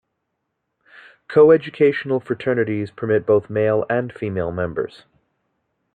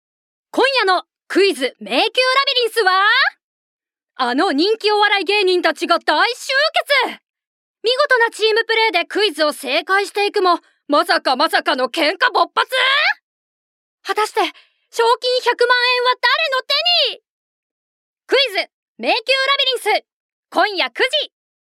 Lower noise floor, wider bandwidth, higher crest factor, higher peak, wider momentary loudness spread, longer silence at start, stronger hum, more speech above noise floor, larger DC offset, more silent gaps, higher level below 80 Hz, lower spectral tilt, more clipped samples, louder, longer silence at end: second, -76 dBFS vs under -90 dBFS; second, 4.7 kHz vs 16 kHz; about the same, 18 dB vs 18 dB; about the same, -2 dBFS vs 0 dBFS; first, 11 LU vs 7 LU; first, 1.3 s vs 0.55 s; neither; second, 57 dB vs over 74 dB; neither; second, none vs 3.43-3.79 s, 7.47-7.74 s, 13.22-13.98 s, 17.29-18.16 s, 18.73-18.95 s, 20.12-20.43 s; first, -58 dBFS vs -80 dBFS; first, -9 dB/octave vs -0.5 dB/octave; neither; second, -19 LUFS vs -16 LUFS; first, 1.05 s vs 0.45 s